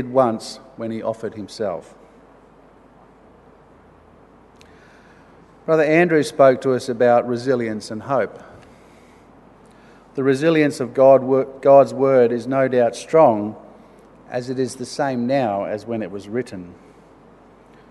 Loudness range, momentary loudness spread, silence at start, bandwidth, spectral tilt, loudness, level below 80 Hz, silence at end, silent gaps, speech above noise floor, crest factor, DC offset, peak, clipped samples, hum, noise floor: 14 LU; 16 LU; 0 s; 12 kHz; -6.5 dB/octave; -18 LUFS; -60 dBFS; 1.2 s; none; 31 dB; 20 dB; under 0.1%; 0 dBFS; under 0.1%; none; -49 dBFS